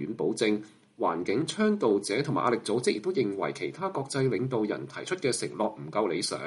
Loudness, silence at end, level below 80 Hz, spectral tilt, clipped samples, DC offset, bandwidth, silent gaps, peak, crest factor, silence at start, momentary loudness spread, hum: -29 LUFS; 0 s; -72 dBFS; -5 dB/octave; under 0.1%; under 0.1%; 11.5 kHz; none; -12 dBFS; 16 dB; 0 s; 6 LU; none